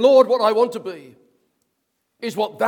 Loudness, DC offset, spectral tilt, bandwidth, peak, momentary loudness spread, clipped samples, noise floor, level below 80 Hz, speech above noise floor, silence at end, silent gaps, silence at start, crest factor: -18 LUFS; under 0.1%; -4.5 dB/octave; 17 kHz; -2 dBFS; 19 LU; under 0.1%; -73 dBFS; -78 dBFS; 56 dB; 0 s; none; 0 s; 18 dB